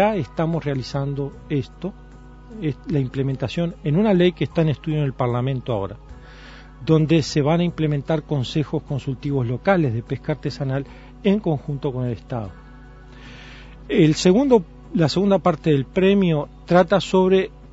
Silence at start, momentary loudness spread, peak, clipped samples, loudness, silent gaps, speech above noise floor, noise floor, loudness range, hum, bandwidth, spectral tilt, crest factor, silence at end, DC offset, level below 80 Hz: 0 s; 14 LU; -2 dBFS; under 0.1%; -21 LUFS; none; 22 dB; -42 dBFS; 7 LU; none; 8 kHz; -7 dB/octave; 20 dB; 0 s; under 0.1%; -44 dBFS